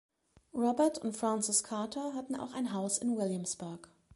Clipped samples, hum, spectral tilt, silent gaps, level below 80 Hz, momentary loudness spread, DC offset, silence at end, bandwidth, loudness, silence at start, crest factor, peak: under 0.1%; none; -4 dB/octave; none; -74 dBFS; 11 LU; under 0.1%; 0.3 s; 12 kHz; -34 LUFS; 0.55 s; 20 dB; -16 dBFS